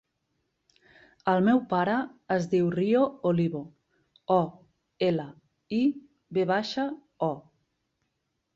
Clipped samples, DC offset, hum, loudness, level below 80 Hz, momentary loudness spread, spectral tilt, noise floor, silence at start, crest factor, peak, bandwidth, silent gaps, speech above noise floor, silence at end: under 0.1%; under 0.1%; none; -27 LUFS; -68 dBFS; 11 LU; -7.5 dB/octave; -79 dBFS; 1.25 s; 18 dB; -10 dBFS; 7.6 kHz; none; 53 dB; 1.15 s